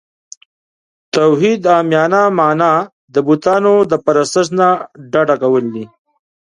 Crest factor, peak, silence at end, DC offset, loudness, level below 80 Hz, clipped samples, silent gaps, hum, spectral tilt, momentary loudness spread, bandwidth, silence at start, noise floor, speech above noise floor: 14 dB; 0 dBFS; 0.65 s; under 0.1%; -13 LUFS; -60 dBFS; under 0.1%; 2.93-3.08 s; none; -5.5 dB/octave; 8 LU; 11 kHz; 1.15 s; under -90 dBFS; over 78 dB